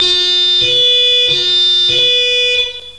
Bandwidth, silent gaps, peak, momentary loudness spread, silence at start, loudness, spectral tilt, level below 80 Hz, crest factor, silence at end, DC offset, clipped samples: 11.5 kHz; none; -2 dBFS; 3 LU; 0 s; -9 LUFS; -0.5 dB/octave; -46 dBFS; 10 dB; 0 s; 0.8%; under 0.1%